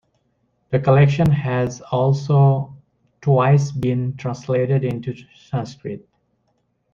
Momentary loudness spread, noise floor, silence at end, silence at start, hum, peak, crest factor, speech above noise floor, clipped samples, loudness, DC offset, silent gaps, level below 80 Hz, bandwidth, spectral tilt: 16 LU; -68 dBFS; 0.95 s; 0.7 s; none; -2 dBFS; 18 dB; 50 dB; under 0.1%; -19 LUFS; under 0.1%; none; -50 dBFS; 7.2 kHz; -8 dB/octave